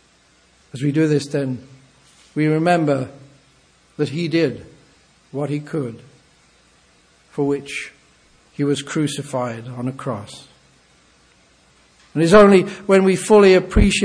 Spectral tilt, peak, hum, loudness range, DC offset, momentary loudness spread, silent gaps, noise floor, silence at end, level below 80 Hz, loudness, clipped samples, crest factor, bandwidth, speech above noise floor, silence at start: -6 dB/octave; 0 dBFS; none; 12 LU; under 0.1%; 21 LU; none; -55 dBFS; 0 s; -36 dBFS; -18 LUFS; under 0.1%; 20 dB; 11 kHz; 38 dB; 0.75 s